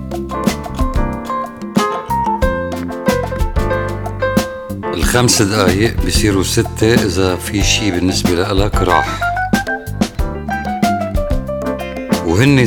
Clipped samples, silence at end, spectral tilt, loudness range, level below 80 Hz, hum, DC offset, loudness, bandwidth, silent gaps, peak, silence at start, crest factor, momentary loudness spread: under 0.1%; 0 s; -4.5 dB/octave; 5 LU; -24 dBFS; none; under 0.1%; -16 LUFS; 19.5 kHz; none; 0 dBFS; 0 s; 16 dB; 9 LU